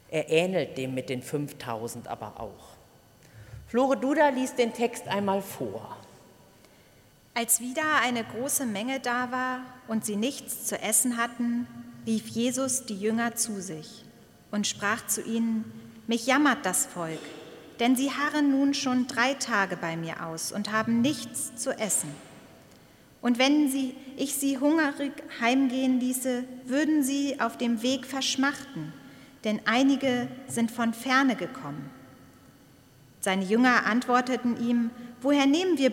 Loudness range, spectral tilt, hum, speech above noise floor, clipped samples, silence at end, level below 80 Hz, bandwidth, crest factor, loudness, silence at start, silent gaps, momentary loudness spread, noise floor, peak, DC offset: 4 LU; -3 dB/octave; none; 30 dB; under 0.1%; 0 s; -66 dBFS; 16.5 kHz; 20 dB; -27 LUFS; 0.1 s; none; 14 LU; -58 dBFS; -8 dBFS; under 0.1%